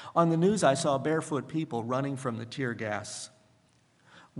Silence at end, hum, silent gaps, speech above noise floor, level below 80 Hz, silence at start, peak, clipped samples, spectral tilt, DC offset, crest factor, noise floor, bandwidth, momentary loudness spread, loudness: 0 s; none; none; 37 dB; -70 dBFS; 0 s; -10 dBFS; under 0.1%; -5.5 dB/octave; under 0.1%; 22 dB; -66 dBFS; 11.5 kHz; 11 LU; -29 LUFS